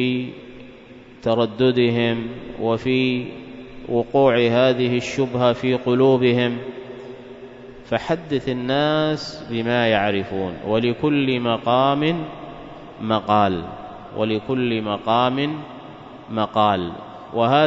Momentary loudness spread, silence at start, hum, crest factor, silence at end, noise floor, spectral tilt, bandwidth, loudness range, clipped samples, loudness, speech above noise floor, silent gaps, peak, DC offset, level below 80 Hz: 19 LU; 0 s; none; 18 dB; 0 s; -43 dBFS; -7 dB/octave; 7.8 kHz; 4 LU; under 0.1%; -20 LUFS; 23 dB; none; -2 dBFS; under 0.1%; -52 dBFS